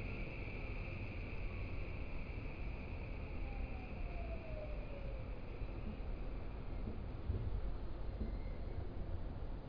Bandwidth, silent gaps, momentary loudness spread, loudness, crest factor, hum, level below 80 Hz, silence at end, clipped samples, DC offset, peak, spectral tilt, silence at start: 5.2 kHz; none; 3 LU; -47 LUFS; 14 dB; none; -46 dBFS; 0 s; under 0.1%; under 0.1%; -28 dBFS; -6.5 dB/octave; 0 s